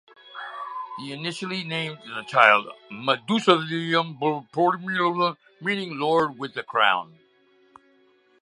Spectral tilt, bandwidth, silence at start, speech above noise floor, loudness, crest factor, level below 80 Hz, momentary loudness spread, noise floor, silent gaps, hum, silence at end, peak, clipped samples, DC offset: -5 dB/octave; 11 kHz; 0.25 s; 37 dB; -23 LUFS; 24 dB; -76 dBFS; 16 LU; -60 dBFS; none; none; 1.35 s; 0 dBFS; under 0.1%; under 0.1%